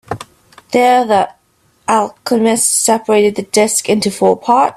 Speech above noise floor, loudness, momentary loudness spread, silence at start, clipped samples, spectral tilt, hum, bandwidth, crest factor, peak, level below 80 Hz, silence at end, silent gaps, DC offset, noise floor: 42 dB; -13 LUFS; 7 LU; 0.1 s; under 0.1%; -3 dB/octave; none; 15.5 kHz; 14 dB; 0 dBFS; -54 dBFS; 0.05 s; none; under 0.1%; -54 dBFS